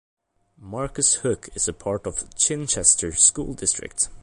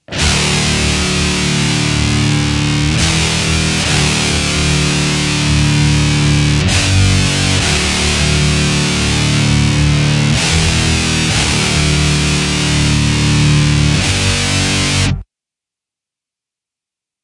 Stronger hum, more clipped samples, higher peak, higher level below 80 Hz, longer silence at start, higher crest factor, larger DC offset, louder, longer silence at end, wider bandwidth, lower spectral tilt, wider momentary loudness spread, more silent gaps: neither; neither; about the same, -2 dBFS vs 0 dBFS; second, -46 dBFS vs -24 dBFS; first, 0.6 s vs 0.1 s; first, 22 dB vs 12 dB; neither; second, -20 LUFS vs -12 LUFS; second, 0 s vs 2 s; about the same, 11.5 kHz vs 11.5 kHz; second, -2 dB/octave vs -4 dB/octave; first, 13 LU vs 2 LU; neither